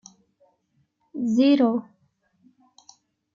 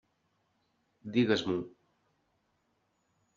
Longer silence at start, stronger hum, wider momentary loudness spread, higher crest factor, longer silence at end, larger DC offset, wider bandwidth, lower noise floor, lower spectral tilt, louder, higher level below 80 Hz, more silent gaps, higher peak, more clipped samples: about the same, 1.15 s vs 1.05 s; neither; second, 13 LU vs 20 LU; about the same, 18 dB vs 22 dB; second, 1.55 s vs 1.7 s; neither; about the same, 7.4 kHz vs 7.4 kHz; second, -69 dBFS vs -77 dBFS; first, -6 dB/octave vs -4.5 dB/octave; first, -21 LUFS vs -31 LUFS; about the same, -76 dBFS vs -76 dBFS; neither; first, -10 dBFS vs -14 dBFS; neither